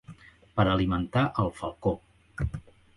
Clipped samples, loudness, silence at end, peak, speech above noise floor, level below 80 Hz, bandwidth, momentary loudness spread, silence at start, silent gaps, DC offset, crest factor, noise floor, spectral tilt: under 0.1%; -29 LUFS; 0.35 s; -8 dBFS; 24 dB; -42 dBFS; 11.5 kHz; 13 LU; 0.1 s; none; under 0.1%; 20 dB; -51 dBFS; -8 dB/octave